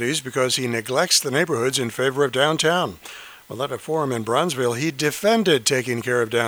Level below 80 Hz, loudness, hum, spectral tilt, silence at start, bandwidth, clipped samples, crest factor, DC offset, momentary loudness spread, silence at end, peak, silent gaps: -62 dBFS; -21 LUFS; none; -3.5 dB/octave; 0 s; over 20 kHz; under 0.1%; 18 dB; under 0.1%; 11 LU; 0 s; -2 dBFS; none